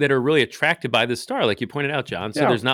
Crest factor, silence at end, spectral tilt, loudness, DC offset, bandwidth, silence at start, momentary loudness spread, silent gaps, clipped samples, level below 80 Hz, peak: 16 dB; 0 s; -5 dB/octave; -21 LUFS; under 0.1%; 15.5 kHz; 0 s; 6 LU; none; under 0.1%; -64 dBFS; -4 dBFS